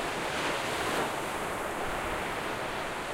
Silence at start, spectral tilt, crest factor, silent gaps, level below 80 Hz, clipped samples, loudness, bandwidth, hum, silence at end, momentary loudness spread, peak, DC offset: 0 s; -3 dB/octave; 14 dB; none; -50 dBFS; under 0.1%; -32 LUFS; 16 kHz; none; 0 s; 3 LU; -18 dBFS; under 0.1%